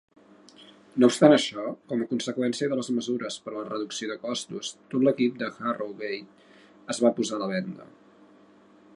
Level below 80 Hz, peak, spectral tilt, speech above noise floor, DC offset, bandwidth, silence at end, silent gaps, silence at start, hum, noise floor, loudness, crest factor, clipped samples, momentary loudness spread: -78 dBFS; -2 dBFS; -4.5 dB/octave; 30 dB; under 0.1%; 11.5 kHz; 1.1 s; none; 0.6 s; none; -56 dBFS; -27 LUFS; 24 dB; under 0.1%; 15 LU